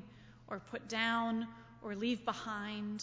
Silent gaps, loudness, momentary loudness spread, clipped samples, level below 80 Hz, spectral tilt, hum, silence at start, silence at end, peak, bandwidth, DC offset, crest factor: none; -38 LUFS; 15 LU; under 0.1%; -70 dBFS; -4 dB/octave; none; 0 s; 0 s; -20 dBFS; 7.8 kHz; under 0.1%; 20 dB